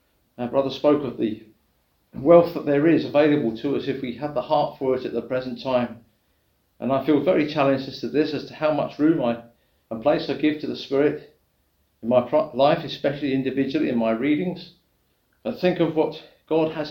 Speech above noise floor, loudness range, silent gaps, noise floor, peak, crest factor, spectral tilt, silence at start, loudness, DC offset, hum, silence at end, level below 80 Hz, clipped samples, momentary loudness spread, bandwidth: 45 dB; 4 LU; none; -67 dBFS; -2 dBFS; 22 dB; -8 dB/octave; 0.4 s; -23 LUFS; under 0.1%; none; 0 s; -60 dBFS; under 0.1%; 10 LU; 16.5 kHz